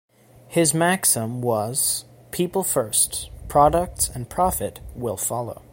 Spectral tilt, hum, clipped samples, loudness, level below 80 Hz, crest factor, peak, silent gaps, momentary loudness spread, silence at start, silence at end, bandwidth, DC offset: -3.5 dB/octave; none; under 0.1%; -21 LUFS; -42 dBFS; 18 dB; -4 dBFS; none; 11 LU; 0.5 s; 0.15 s; 17 kHz; under 0.1%